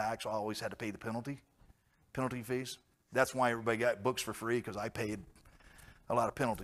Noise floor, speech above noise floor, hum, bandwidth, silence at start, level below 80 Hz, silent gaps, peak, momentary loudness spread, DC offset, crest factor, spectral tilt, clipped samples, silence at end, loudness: -67 dBFS; 31 dB; none; 15.5 kHz; 0 s; -64 dBFS; none; -14 dBFS; 12 LU; under 0.1%; 22 dB; -5 dB/octave; under 0.1%; 0 s; -36 LUFS